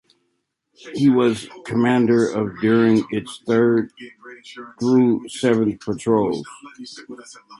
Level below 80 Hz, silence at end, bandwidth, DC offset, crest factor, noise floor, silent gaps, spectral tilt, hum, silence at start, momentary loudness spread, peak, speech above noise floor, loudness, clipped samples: -58 dBFS; 0.05 s; 11.5 kHz; under 0.1%; 16 dB; -73 dBFS; none; -6.5 dB/octave; none; 0.85 s; 22 LU; -4 dBFS; 53 dB; -19 LUFS; under 0.1%